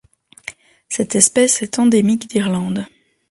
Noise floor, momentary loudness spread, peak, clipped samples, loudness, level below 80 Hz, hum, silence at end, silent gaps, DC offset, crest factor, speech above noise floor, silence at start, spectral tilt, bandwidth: -37 dBFS; 22 LU; 0 dBFS; under 0.1%; -16 LUFS; -56 dBFS; none; 0.45 s; none; under 0.1%; 18 dB; 22 dB; 0.45 s; -4 dB/octave; 11.5 kHz